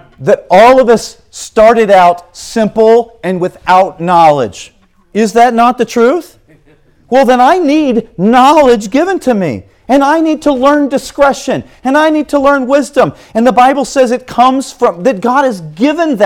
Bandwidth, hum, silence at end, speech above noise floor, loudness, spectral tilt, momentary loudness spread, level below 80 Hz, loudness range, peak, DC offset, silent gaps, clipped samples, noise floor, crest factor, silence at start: 17 kHz; none; 0 s; 37 dB; -9 LUFS; -5 dB/octave; 10 LU; -42 dBFS; 2 LU; 0 dBFS; under 0.1%; none; 2%; -46 dBFS; 10 dB; 0.2 s